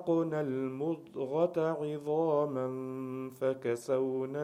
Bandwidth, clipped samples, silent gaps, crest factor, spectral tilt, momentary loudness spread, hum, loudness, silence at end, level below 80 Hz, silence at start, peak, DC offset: 15.5 kHz; under 0.1%; none; 16 dB; -7.5 dB/octave; 8 LU; none; -33 LUFS; 0 s; -80 dBFS; 0 s; -16 dBFS; under 0.1%